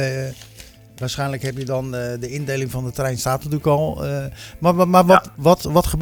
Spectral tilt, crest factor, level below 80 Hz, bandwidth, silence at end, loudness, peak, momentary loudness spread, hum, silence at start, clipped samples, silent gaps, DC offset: -6 dB/octave; 20 dB; -38 dBFS; over 20 kHz; 0 s; -19 LUFS; 0 dBFS; 13 LU; none; 0 s; under 0.1%; none; under 0.1%